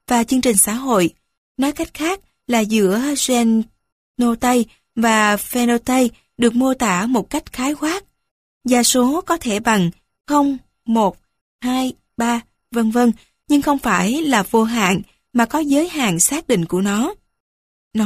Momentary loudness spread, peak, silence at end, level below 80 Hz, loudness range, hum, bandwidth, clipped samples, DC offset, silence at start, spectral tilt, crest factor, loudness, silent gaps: 8 LU; -2 dBFS; 0 s; -48 dBFS; 3 LU; none; 15.5 kHz; under 0.1%; under 0.1%; 0.1 s; -4 dB/octave; 16 dB; -18 LUFS; 1.38-1.55 s, 3.92-4.14 s, 8.31-8.61 s, 11.41-11.59 s, 17.40-17.91 s